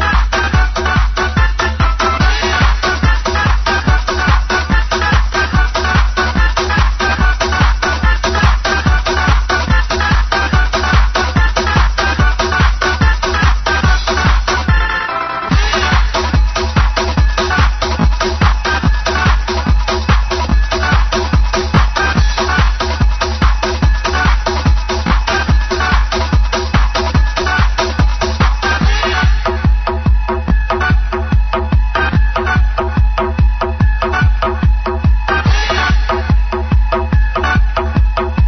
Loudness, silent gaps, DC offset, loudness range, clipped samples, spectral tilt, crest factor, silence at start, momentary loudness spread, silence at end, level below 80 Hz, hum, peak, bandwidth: -14 LUFS; none; under 0.1%; 1 LU; under 0.1%; -5 dB/octave; 12 dB; 0 s; 2 LU; 0 s; -14 dBFS; none; 0 dBFS; 6.4 kHz